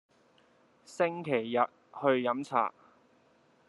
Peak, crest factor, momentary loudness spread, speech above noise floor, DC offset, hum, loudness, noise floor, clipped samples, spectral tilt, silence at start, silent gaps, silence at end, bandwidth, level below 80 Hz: -12 dBFS; 22 dB; 5 LU; 36 dB; under 0.1%; none; -31 LUFS; -66 dBFS; under 0.1%; -6 dB/octave; 0.9 s; none; 1 s; 11.5 kHz; -84 dBFS